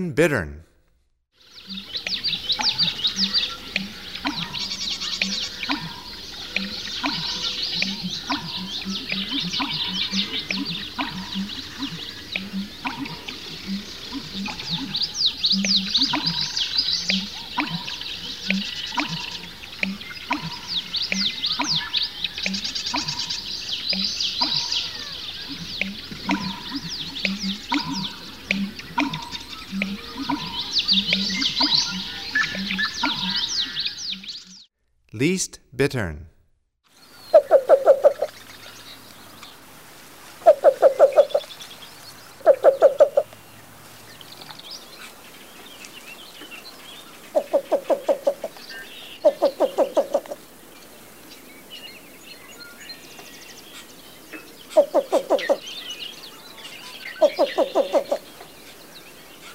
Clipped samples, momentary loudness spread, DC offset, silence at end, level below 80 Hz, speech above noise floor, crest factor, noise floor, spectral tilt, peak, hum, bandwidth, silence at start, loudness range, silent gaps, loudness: under 0.1%; 22 LU; 0.3%; 0 s; -54 dBFS; 42 dB; 24 dB; -65 dBFS; -3.5 dB/octave; -2 dBFS; none; 16 kHz; 0 s; 8 LU; none; -23 LUFS